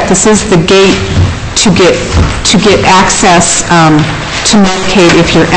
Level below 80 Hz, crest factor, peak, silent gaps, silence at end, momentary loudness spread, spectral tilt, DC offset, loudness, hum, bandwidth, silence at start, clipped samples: -22 dBFS; 6 dB; 0 dBFS; none; 0 s; 6 LU; -4 dB/octave; 1%; -6 LUFS; none; 10.5 kHz; 0 s; 0.5%